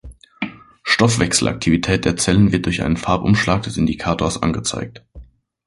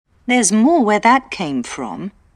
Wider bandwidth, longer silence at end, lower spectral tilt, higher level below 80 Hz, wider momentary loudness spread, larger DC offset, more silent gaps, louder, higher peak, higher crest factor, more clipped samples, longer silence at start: about the same, 11.5 kHz vs 12.5 kHz; first, 0.45 s vs 0.25 s; about the same, -4.5 dB/octave vs -3.5 dB/octave; first, -36 dBFS vs -54 dBFS; about the same, 14 LU vs 14 LU; neither; neither; about the same, -17 LUFS vs -15 LUFS; about the same, -2 dBFS vs 0 dBFS; about the same, 18 dB vs 16 dB; neither; second, 0.05 s vs 0.3 s